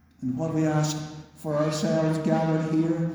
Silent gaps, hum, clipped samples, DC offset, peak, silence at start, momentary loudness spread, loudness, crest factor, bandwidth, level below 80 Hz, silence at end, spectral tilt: none; none; under 0.1%; under 0.1%; -10 dBFS; 0.2 s; 9 LU; -26 LUFS; 14 dB; over 20 kHz; -58 dBFS; 0 s; -6.5 dB/octave